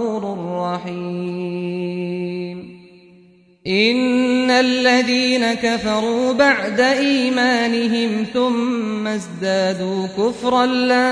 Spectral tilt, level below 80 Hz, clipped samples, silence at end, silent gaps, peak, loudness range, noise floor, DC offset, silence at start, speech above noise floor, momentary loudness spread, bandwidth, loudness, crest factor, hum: -4.5 dB/octave; -58 dBFS; under 0.1%; 0 s; none; -2 dBFS; 9 LU; -50 dBFS; under 0.1%; 0 s; 33 dB; 10 LU; 10.5 kHz; -18 LUFS; 16 dB; none